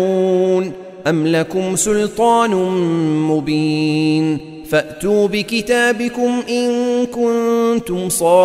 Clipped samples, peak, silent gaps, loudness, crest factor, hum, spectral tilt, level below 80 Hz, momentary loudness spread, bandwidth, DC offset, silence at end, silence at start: under 0.1%; -2 dBFS; none; -16 LUFS; 14 dB; none; -5 dB/octave; -48 dBFS; 5 LU; 16 kHz; under 0.1%; 0 s; 0 s